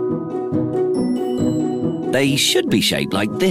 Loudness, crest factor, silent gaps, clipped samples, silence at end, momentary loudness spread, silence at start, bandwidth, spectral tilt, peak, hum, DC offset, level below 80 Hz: -18 LUFS; 14 dB; none; under 0.1%; 0 s; 7 LU; 0 s; 15.5 kHz; -4.5 dB/octave; -6 dBFS; none; under 0.1%; -52 dBFS